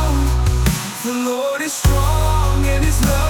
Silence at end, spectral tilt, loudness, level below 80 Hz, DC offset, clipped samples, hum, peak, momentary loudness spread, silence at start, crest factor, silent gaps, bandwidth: 0 s; -5 dB/octave; -18 LUFS; -18 dBFS; under 0.1%; under 0.1%; none; -4 dBFS; 4 LU; 0 s; 12 dB; none; 19.5 kHz